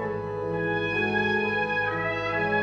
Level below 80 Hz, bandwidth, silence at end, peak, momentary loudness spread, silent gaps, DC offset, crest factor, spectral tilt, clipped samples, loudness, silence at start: -54 dBFS; 8 kHz; 0 s; -14 dBFS; 6 LU; none; under 0.1%; 14 dB; -6.5 dB/octave; under 0.1%; -26 LUFS; 0 s